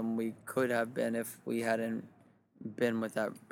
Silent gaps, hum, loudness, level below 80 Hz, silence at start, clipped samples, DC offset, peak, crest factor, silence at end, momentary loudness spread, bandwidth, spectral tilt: none; none; -35 LUFS; -80 dBFS; 0 s; under 0.1%; under 0.1%; -18 dBFS; 18 dB; 0.15 s; 7 LU; 18.5 kHz; -5.5 dB/octave